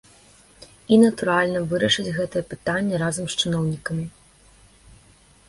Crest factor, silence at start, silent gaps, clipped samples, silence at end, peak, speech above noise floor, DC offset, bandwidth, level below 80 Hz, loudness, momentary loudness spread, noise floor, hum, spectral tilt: 20 dB; 0.6 s; none; under 0.1%; 1.4 s; -4 dBFS; 32 dB; under 0.1%; 11.5 kHz; -54 dBFS; -22 LUFS; 12 LU; -54 dBFS; none; -5 dB/octave